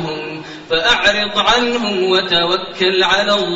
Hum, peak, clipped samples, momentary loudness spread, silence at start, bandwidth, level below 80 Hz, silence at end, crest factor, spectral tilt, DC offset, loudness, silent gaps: none; 0 dBFS; under 0.1%; 11 LU; 0 s; 8 kHz; -46 dBFS; 0 s; 16 dB; -3 dB/octave; under 0.1%; -14 LUFS; none